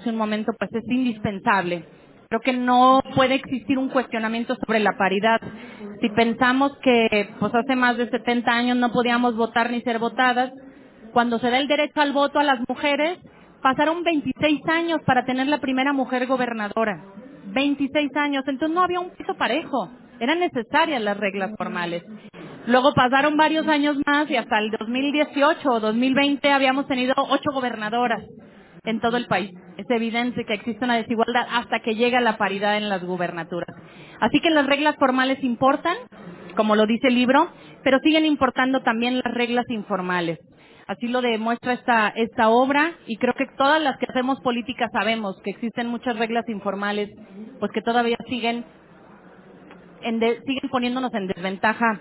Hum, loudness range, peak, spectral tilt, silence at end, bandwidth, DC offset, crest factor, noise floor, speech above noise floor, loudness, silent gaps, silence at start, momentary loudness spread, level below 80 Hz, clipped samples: none; 5 LU; -4 dBFS; -9 dB/octave; 0 s; 4 kHz; under 0.1%; 18 dB; -48 dBFS; 27 dB; -22 LUFS; none; 0 s; 10 LU; -58 dBFS; under 0.1%